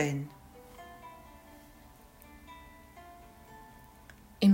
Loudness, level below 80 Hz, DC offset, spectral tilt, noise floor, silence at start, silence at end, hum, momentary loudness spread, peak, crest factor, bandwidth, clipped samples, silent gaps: -38 LUFS; -60 dBFS; under 0.1%; -6.5 dB/octave; -56 dBFS; 0 s; 0 s; none; 16 LU; -14 dBFS; 22 dB; 16 kHz; under 0.1%; none